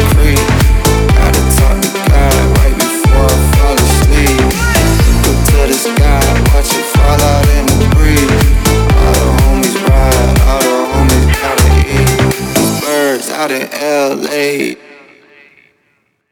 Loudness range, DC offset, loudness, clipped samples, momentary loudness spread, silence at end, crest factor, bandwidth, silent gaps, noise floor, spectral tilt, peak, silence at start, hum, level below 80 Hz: 3 LU; under 0.1%; -10 LUFS; under 0.1%; 4 LU; 1.55 s; 8 dB; over 20 kHz; none; -59 dBFS; -5 dB/octave; 0 dBFS; 0 s; none; -12 dBFS